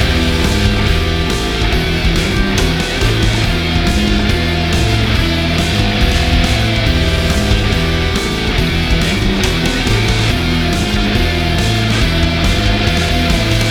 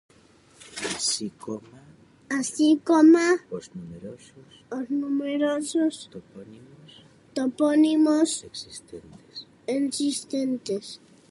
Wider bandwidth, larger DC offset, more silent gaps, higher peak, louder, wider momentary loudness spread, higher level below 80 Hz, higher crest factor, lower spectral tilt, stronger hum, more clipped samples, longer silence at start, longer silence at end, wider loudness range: first, 19 kHz vs 11.5 kHz; neither; neither; first, 0 dBFS vs -8 dBFS; first, -14 LUFS vs -24 LUFS; second, 1 LU vs 22 LU; first, -18 dBFS vs -68 dBFS; second, 12 dB vs 18 dB; first, -5 dB/octave vs -3.5 dB/octave; neither; neither; second, 0 s vs 0.65 s; second, 0 s vs 0.35 s; second, 1 LU vs 7 LU